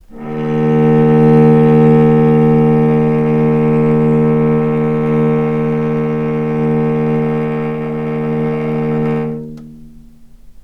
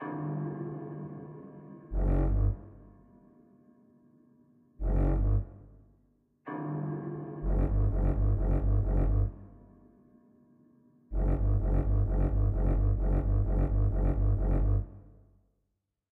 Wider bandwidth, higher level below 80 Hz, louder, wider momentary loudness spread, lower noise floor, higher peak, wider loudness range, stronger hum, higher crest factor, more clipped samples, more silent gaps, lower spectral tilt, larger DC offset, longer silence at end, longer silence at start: first, 4.1 kHz vs 2.5 kHz; second, -42 dBFS vs -32 dBFS; first, -13 LUFS vs -31 LUFS; second, 10 LU vs 13 LU; second, -38 dBFS vs -82 dBFS; first, 0 dBFS vs -16 dBFS; about the same, 7 LU vs 7 LU; neither; about the same, 12 dB vs 14 dB; neither; neither; second, -10.5 dB/octave vs -12 dB/octave; neither; second, 0.1 s vs 1.1 s; about the same, 0.1 s vs 0 s